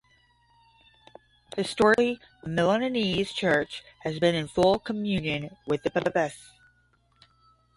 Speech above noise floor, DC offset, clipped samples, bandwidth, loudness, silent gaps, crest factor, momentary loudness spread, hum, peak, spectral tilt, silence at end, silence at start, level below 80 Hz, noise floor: 40 dB; under 0.1%; under 0.1%; 11.5 kHz; -26 LUFS; none; 20 dB; 12 LU; none; -8 dBFS; -5.5 dB/octave; 1.35 s; 1.55 s; -56 dBFS; -66 dBFS